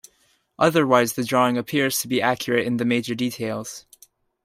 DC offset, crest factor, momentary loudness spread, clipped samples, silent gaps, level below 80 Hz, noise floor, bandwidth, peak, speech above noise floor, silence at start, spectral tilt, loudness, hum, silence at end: under 0.1%; 20 dB; 10 LU; under 0.1%; none; -64 dBFS; -64 dBFS; 16 kHz; -4 dBFS; 42 dB; 0.6 s; -4.5 dB/octave; -21 LUFS; none; 0.65 s